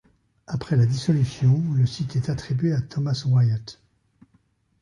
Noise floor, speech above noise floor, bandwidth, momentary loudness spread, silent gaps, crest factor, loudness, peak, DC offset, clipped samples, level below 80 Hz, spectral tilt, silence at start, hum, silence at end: -64 dBFS; 43 dB; 10.5 kHz; 9 LU; none; 14 dB; -23 LUFS; -10 dBFS; under 0.1%; under 0.1%; -52 dBFS; -7.5 dB/octave; 0.5 s; none; 1.1 s